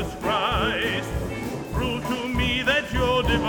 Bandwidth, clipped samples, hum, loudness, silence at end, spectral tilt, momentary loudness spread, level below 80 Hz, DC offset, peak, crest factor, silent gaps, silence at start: 19 kHz; under 0.1%; none; -24 LUFS; 0 s; -5 dB/octave; 8 LU; -34 dBFS; under 0.1%; -8 dBFS; 16 dB; none; 0 s